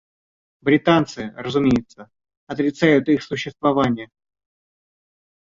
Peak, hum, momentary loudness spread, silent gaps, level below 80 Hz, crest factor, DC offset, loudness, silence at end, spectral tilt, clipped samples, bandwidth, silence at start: -2 dBFS; none; 12 LU; 2.37-2.47 s; -52 dBFS; 18 dB; under 0.1%; -20 LUFS; 1.45 s; -6.5 dB/octave; under 0.1%; 7.6 kHz; 0.65 s